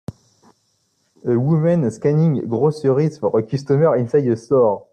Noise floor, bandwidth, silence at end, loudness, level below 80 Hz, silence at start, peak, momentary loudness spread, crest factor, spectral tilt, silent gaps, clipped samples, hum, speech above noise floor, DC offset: -65 dBFS; 9.2 kHz; 0.15 s; -18 LUFS; -58 dBFS; 0.1 s; -4 dBFS; 5 LU; 14 dB; -9 dB/octave; none; under 0.1%; none; 49 dB; under 0.1%